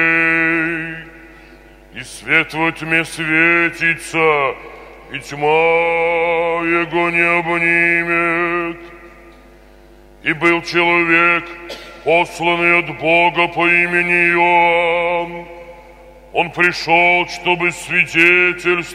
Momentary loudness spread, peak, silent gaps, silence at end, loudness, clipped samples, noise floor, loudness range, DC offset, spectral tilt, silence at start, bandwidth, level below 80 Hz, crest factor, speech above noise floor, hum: 16 LU; 0 dBFS; none; 0 s; -14 LUFS; under 0.1%; -43 dBFS; 4 LU; under 0.1%; -4.5 dB/octave; 0 s; 15 kHz; -48 dBFS; 16 dB; 28 dB; none